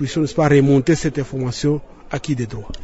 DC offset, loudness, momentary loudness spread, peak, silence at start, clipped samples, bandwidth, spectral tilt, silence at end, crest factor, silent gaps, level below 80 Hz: under 0.1%; -19 LUFS; 13 LU; -4 dBFS; 0 s; under 0.1%; 8 kHz; -6.5 dB/octave; 0 s; 14 dB; none; -40 dBFS